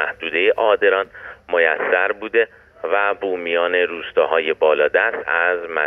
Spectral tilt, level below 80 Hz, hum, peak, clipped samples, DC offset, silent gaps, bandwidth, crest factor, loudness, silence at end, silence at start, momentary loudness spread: -5.5 dB/octave; -60 dBFS; none; -4 dBFS; under 0.1%; under 0.1%; none; 3.9 kHz; 16 dB; -18 LUFS; 0 s; 0 s; 7 LU